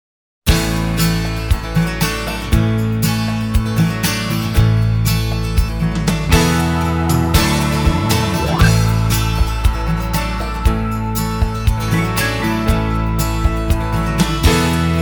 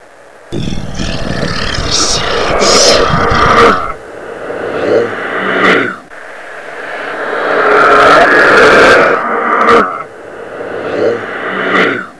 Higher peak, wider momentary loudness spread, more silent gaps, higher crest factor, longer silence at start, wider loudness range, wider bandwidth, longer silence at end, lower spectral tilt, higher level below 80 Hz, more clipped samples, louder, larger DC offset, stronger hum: about the same, 0 dBFS vs 0 dBFS; second, 5 LU vs 20 LU; neither; first, 16 dB vs 10 dB; first, 0.45 s vs 0 s; second, 3 LU vs 7 LU; first, over 20 kHz vs 11 kHz; about the same, 0 s vs 0 s; first, -5.5 dB/octave vs -3 dB/octave; first, -22 dBFS vs -30 dBFS; second, under 0.1% vs 0.9%; second, -17 LUFS vs -9 LUFS; neither; neither